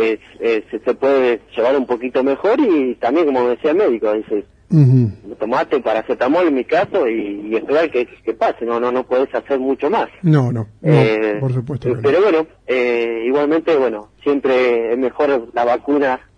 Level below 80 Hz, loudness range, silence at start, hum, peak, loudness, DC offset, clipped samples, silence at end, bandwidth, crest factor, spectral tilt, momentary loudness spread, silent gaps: -54 dBFS; 2 LU; 0 s; none; 0 dBFS; -17 LUFS; under 0.1%; under 0.1%; 0.2 s; 9.2 kHz; 16 dB; -8.5 dB/octave; 7 LU; none